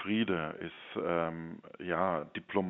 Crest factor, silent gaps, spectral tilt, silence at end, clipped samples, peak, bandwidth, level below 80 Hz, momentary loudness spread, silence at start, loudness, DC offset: 20 dB; none; -4.5 dB/octave; 0 s; under 0.1%; -16 dBFS; 4 kHz; -68 dBFS; 12 LU; 0 s; -35 LUFS; under 0.1%